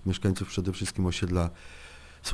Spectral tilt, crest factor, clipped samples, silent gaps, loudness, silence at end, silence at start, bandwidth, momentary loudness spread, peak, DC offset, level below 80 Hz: -5.5 dB/octave; 18 dB; under 0.1%; none; -30 LUFS; 0 s; 0 s; 11 kHz; 19 LU; -12 dBFS; under 0.1%; -44 dBFS